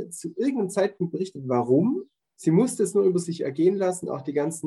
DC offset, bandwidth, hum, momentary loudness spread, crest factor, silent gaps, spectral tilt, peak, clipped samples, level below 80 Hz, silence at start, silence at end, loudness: under 0.1%; 12.5 kHz; none; 8 LU; 16 dB; none; -6.5 dB/octave; -8 dBFS; under 0.1%; -74 dBFS; 0 s; 0 s; -25 LUFS